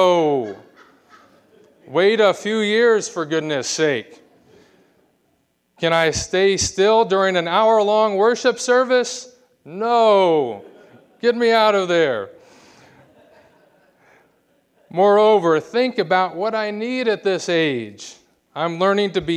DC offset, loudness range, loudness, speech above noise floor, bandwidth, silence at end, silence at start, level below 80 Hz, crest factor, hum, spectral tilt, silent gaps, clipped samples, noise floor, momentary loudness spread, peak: under 0.1%; 5 LU; -18 LUFS; 48 dB; 11.5 kHz; 0 s; 0 s; -54 dBFS; 16 dB; none; -4 dB/octave; none; under 0.1%; -66 dBFS; 12 LU; -2 dBFS